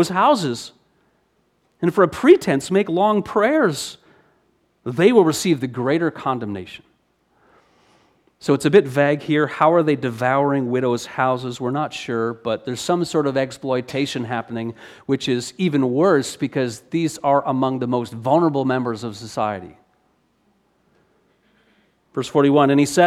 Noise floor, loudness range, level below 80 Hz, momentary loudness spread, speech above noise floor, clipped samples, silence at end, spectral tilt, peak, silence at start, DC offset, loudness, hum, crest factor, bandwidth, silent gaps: -64 dBFS; 5 LU; -62 dBFS; 13 LU; 46 dB; under 0.1%; 0 s; -5.5 dB/octave; -2 dBFS; 0 s; under 0.1%; -19 LUFS; none; 18 dB; 15 kHz; none